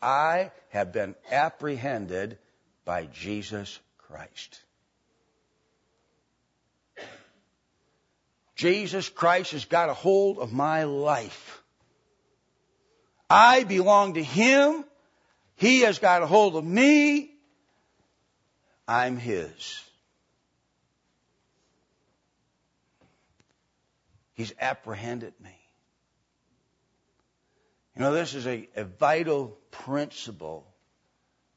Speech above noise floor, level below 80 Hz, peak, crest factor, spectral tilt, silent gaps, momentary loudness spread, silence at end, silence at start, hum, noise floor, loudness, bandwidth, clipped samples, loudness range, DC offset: 50 dB; -70 dBFS; -4 dBFS; 24 dB; -4.5 dB/octave; none; 22 LU; 1 s; 0 s; none; -74 dBFS; -24 LUFS; 8 kHz; under 0.1%; 17 LU; under 0.1%